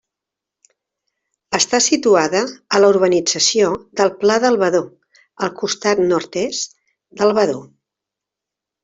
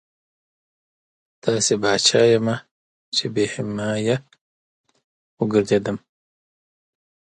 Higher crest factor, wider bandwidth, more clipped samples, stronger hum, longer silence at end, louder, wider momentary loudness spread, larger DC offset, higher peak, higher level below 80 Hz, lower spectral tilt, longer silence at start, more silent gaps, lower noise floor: about the same, 16 dB vs 20 dB; second, 8.2 kHz vs 11.5 kHz; neither; neither; second, 1.2 s vs 1.4 s; first, -16 LUFS vs -20 LUFS; about the same, 10 LU vs 11 LU; neither; about the same, -2 dBFS vs -2 dBFS; about the same, -60 dBFS vs -60 dBFS; about the same, -3 dB/octave vs -4 dB/octave; about the same, 1.5 s vs 1.45 s; second, none vs 2.71-3.12 s, 4.41-4.84 s, 5.04-5.37 s; second, -85 dBFS vs under -90 dBFS